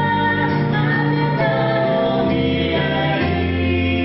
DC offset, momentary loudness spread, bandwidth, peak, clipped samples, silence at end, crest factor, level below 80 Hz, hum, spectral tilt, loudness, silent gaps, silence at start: under 0.1%; 1 LU; 5.8 kHz; -6 dBFS; under 0.1%; 0 s; 12 dB; -32 dBFS; none; -11.5 dB/octave; -18 LUFS; none; 0 s